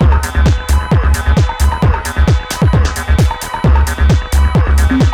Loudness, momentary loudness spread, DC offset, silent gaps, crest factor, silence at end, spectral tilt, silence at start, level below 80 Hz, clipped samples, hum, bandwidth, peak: -13 LUFS; 2 LU; under 0.1%; none; 10 dB; 0 s; -6 dB/octave; 0 s; -12 dBFS; under 0.1%; none; 15.5 kHz; 0 dBFS